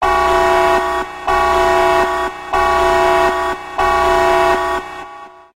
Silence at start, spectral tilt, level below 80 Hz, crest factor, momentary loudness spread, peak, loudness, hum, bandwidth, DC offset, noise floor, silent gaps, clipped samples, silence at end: 0 s; -4 dB/octave; -34 dBFS; 14 dB; 8 LU; 0 dBFS; -14 LUFS; none; 16 kHz; under 0.1%; -36 dBFS; none; under 0.1%; 0.25 s